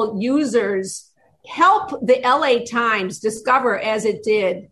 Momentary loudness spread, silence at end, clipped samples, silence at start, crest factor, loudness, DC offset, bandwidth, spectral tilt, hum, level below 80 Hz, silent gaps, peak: 9 LU; 0.05 s; under 0.1%; 0 s; 14 dB; -18 LUFS; under 0.1%; 12.5 kHz; -4 dB/octave; none; -62 dBFS; none; -4 dBFS